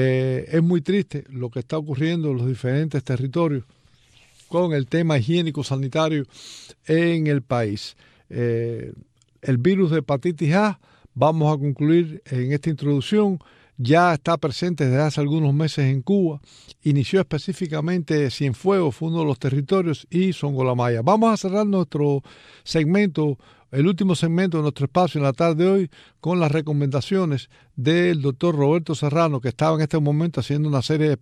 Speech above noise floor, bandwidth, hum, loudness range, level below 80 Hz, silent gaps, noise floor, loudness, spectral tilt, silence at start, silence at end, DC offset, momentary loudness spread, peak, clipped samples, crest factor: 34 dB; 10.5 kHz; none; 3 LU; -58 dBFS; none; -55 dBFS; -21 LUFS; -7.5 dB/octave; 0 s; 0.05 s; under 0.1%; 9 LU; -4 dBFS; under 0.1%; 16 dB